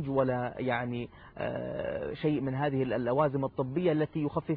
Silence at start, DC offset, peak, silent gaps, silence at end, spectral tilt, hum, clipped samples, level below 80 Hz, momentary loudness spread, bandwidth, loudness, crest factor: 0 s; under 0.1%; -14 dBFS; none; 0 s; -6.5 dB/octave; none; under 0.1%; -58 dBFS; 8 LU; 4.9 kHz; -31 LUFS; 16 dB